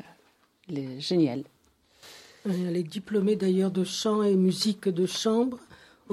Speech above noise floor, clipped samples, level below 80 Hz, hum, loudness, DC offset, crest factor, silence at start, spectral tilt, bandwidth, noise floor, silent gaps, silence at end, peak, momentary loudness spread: 38 dB; under 0.1%; -72 dBFS; none; -27 LUFS; under 0.1%; 14 dB; 0.7 s; -6 dB/octave; 14 kHz; -64 dBFS; none; 0 s; -14 dBFS; 14 LU